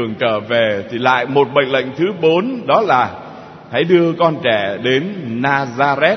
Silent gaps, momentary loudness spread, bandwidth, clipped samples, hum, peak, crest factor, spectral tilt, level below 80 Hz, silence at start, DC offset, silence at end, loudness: none; 7 LU; 6.4 kHz; under 0.1%; none; 0 dBFS; 16 dB; -6.5 dB/octave; -60 dBFS; 0 s; under 0.1%; 0 s; -15 LUFS